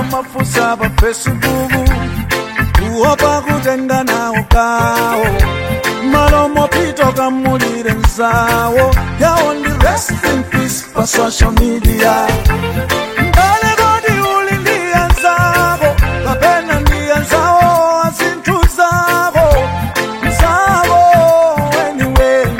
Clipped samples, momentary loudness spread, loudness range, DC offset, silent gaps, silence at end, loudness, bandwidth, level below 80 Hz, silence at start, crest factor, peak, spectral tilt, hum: under 0.1%; 6 LU; 2 LU; under 0.1%; none; 0 s; -12 LUFS; 16.5 kHz; -18 dBFS; 0 s; 12 dB; 0 dBFS; -5 dB/octave; none